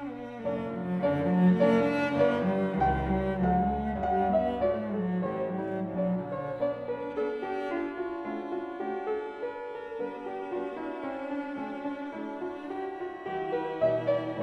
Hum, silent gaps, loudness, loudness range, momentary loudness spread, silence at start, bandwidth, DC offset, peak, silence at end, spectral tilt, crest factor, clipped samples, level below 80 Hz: none; none; -30 LUFS; 9 LU; 11 LU; 0 s; 6.4 kHz; under 0.1%; -12 dBFS; 0 s; -9 dB/octave; 16 dB; under 0.1%; -48 dBFS